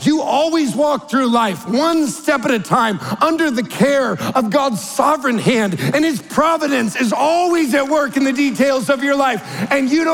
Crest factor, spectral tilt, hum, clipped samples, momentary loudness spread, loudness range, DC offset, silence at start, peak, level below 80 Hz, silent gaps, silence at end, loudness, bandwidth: 14 dB; -4.5 dB/octave; none; under 0.1%; 3 LU; 1 LU; under 0.1%; 0 s; -2 dBFS; -56 dBFS; none; 0 s; -16 LUFS; 18 kHz